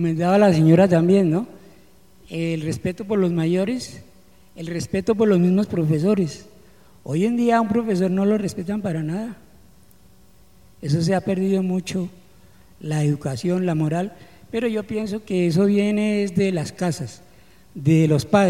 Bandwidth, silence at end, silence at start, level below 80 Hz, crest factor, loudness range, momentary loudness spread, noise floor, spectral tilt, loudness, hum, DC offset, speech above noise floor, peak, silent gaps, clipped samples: 13.5 kHz; 0 s; 0 s; -54 dBFS; 20 dB; 5 LU; 14 LU; -53 dBFS; -7.5 dB/octave; -21 LUFS; none; 0.3%; 34 dB; -2 dBFS; none; under 0.1%